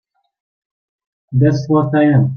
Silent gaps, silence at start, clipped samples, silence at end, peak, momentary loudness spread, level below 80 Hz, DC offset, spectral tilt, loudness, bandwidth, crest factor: none; 1.3 s; under 0.1%; 0 s; -2 dBFS; 4 LU; -52 dBFS; under 0.1%; -9 dB/octave; -14 LUFS; 6.6 kHz; 14 dB